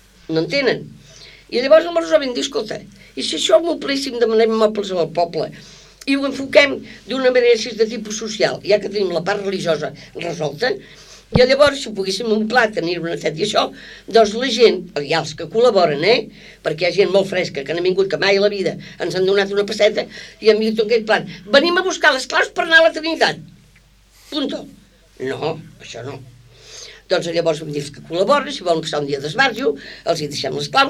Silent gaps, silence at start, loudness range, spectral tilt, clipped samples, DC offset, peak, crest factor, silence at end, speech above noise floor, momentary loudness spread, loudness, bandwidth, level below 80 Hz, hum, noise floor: none; 0.3 s; 6 LU; -4 dB/octave; under 0.1%; under 0.1%; 0 dBFS; 18 dB; 0 s; 33 dB; 13 LU; -17 LUFS; 14 kHz; -50 dBFS; none; -51 dBFS